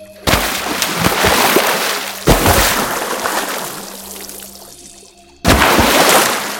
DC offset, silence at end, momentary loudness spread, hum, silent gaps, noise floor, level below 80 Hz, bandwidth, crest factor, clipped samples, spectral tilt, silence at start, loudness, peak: under 0.1%; 0 s; 18 LU; none; none; -42 dBFS; -28 dBFS; 17 kHz; 16 dB; under 0.1%; -3 dB/octave; 0 s; -13 LUFS; 0 dBFS